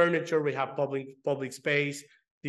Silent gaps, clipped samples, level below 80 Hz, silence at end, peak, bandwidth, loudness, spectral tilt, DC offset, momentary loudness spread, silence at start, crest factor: 2.31-2.41 s; under 0.1%; -84 dBFS; 0 s; -10 dBFS; 12.5 kHz; -30 LUFS; -5.5 dB/octave; under 0.1%; 6 LU; 0 s; 18 dB